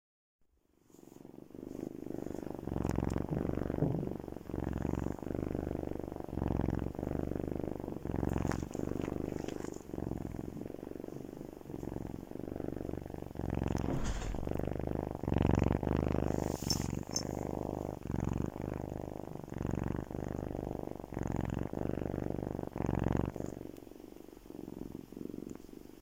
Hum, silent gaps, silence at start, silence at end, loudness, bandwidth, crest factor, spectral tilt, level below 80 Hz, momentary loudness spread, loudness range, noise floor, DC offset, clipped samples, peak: none; none; 0.95 s; 0 s; -38 LUFS; 16.5 kHz; 22 dB; -6.5 dB/octave; -46 dBFS; 12 LU; 7 LU; -71 dBFS; under 0.1%; under 0.1%; -14 dBFS